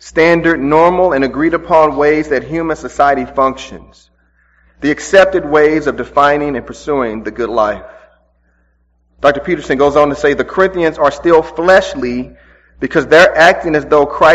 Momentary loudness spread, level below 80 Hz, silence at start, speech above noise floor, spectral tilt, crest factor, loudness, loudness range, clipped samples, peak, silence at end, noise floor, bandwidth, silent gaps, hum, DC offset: 10 LU; -38 dBFS; 0.05 s; 45 dB; -5 dB/octave; 12 dB; -12 LUFS; 6 LU; 0.5%; 0 dBFS; 0 s; -56 dBFS; 9.8 kHz; none; none; under 0.1%